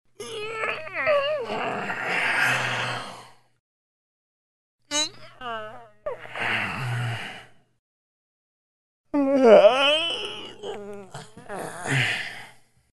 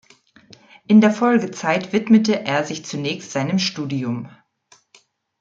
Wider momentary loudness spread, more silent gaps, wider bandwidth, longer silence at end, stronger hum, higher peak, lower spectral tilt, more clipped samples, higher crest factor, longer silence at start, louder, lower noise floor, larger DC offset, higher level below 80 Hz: first, 20 LU vs 12 LU; first, 3.60-4.79 s, 7.79-9.04 s vs none; first, 12 kHz vs 7.6 kHz; second, 0.45 s vs 1.1 s; neither; about the same, -4 dBFS vs -2 dBFS; second, -4 dB/octave vs -5.5 dB/octave; neither; about the same, 22 dB vs 18 dB; second, 0.2 s vs 0.9 s; second, -23 LUFS vs -19 LUFS; second, -50 dBFS vs -56 dBFS; neither; about the same, -64 dBFS vs -68 dBFS